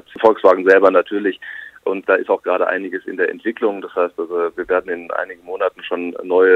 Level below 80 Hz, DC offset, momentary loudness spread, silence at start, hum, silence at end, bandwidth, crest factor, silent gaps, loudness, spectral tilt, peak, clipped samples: -62 dBFS; under 0.1%; 13 LU; 0.15 s; 50 Hz at -70 dBFS; 0 s; 6 kHz; 18 dB; none; -18 LUFS; -6 dB/octave; 0 dBFS; under 0.1%